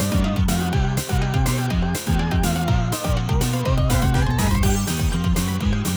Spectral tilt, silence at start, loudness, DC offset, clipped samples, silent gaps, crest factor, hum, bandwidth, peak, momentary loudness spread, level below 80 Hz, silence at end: -5.5 dB/octave; 0 s; -21 LUFS; under 0.1%; under 0.1%; none; 12 dB; none; over 20 kHz; -8 dBFS; 3 LU; -26 dBFS; 0 s